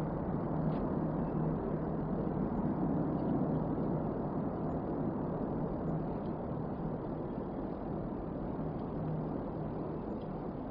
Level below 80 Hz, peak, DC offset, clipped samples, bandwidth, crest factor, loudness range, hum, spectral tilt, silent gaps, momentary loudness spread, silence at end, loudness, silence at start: -50 dBFS; -20 dBFS; under 0.1%; under 0.1%; 4.9 kHz; 14 dB; 4 LU; none; -10.5 dB/octave; none; 6 LU; 0 s; -37 LUFS; 0 s